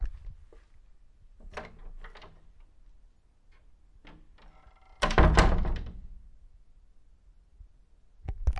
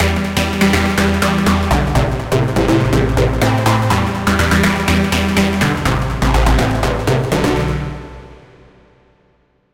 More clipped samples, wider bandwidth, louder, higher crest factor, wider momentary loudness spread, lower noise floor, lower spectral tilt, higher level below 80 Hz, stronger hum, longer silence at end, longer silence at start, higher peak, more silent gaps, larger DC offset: neither; second, 11.5 kHz vs 17 kHz; second, -28 LUFS vs -15 LUFS; first, 26 dB vs 12 dB; first, 28 LU vs 3 LU; about the same, -59 dBFS vs -57 dBFS; about the same, -5.5 dB/octave vs -5.5 dB/octave; second, -34 dBFS vs -24 dBFS; neither; second, 0 s vs 1.4 s; about the same, 0 s vs 0 s; second, -6 dBFS vs -2 dBFS; neither; neither